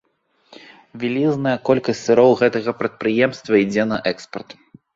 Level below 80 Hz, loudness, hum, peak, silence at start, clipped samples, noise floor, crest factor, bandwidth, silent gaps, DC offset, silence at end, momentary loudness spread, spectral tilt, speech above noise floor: -60 dBFS; -18 LUFS; none; -2 dBFS; 0.95 s; under 0.1%; -63 dBFS; 18 dB; 7.8 kHz; none; under 0.1%; 0.45 s; 11 LU; -6 dB/octave; 45 dB